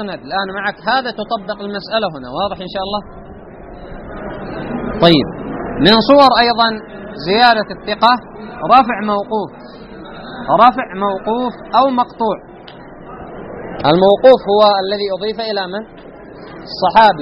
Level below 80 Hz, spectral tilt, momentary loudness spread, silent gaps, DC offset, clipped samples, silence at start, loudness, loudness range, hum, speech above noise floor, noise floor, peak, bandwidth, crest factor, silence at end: -42 dBFS; -7 dB/octave; 23 LU; none; under 0.1%; under 0.1%; 0 s; -14 LUFS; 8 LU; none; 22 dB; -35 dBFS; 0 dBFS; 9.6 kHz; 16 dB; 0 s